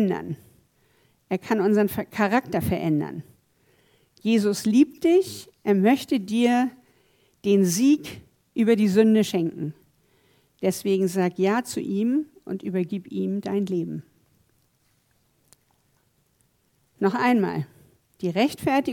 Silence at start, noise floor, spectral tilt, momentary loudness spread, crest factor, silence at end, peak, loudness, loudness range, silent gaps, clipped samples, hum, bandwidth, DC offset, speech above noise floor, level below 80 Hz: 0 s; -67 dBFS; -6 dB/octave; 14 LU; 18 dB; 0 s; -6 dBFS; -23 LUFS; 9 LU; none; under 0.1%; none; 18 kHz; under 0.1%; 45 dB; -60 dBFS